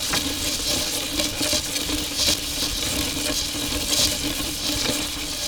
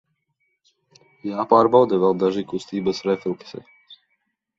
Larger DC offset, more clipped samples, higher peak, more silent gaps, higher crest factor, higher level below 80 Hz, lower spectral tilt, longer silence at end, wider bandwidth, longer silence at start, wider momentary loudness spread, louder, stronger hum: neither; neither; second, -6 dBFS vs -2 dBFS; neither; about the same, 20 dB vs 20 dB; first, -38 dBFS vs -64 dBFS; second, -1.5 dB/octave vs -7 dB/octave; second, 0 s vs 0.65 s; first, over 20 kHz vs 7.8 kHz; second, 0 s vs 1.25 s; second, 4 LU vs 18 LU; about the same, -22 LUFS vs -20 LUFS; neither